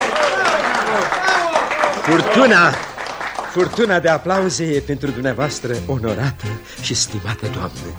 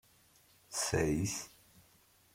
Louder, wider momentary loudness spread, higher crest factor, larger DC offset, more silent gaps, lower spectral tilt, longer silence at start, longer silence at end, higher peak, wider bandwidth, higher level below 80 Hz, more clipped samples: first, -17 LUFS vs -35 LUFS; first, 13 LU vs 10 LU; about the same, 16 dB vs 20 dB; neither; neither; about the same, -4 dB/octave vs -4 dB/octave; second, 0 s vs 0.7 s; second, 0 s vs 0.85 s; first, 0 dBFS vs -18 dBFS; first, over 20 kHz vs 16.5 kHz; first, -44 dBFS vs -56 dBFS; neither